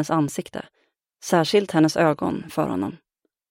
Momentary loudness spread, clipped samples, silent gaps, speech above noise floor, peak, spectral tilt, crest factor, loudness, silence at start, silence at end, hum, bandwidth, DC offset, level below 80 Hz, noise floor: 15 LU; under 0.1%; none; 34 dB; -4 dBFS; -5.5 dB/octave; 18 dB; -22 LUFS; 0 s; 0.55 s; none; 16.5 kHz; under 0.1%; -60 dBFS; -56 dBFS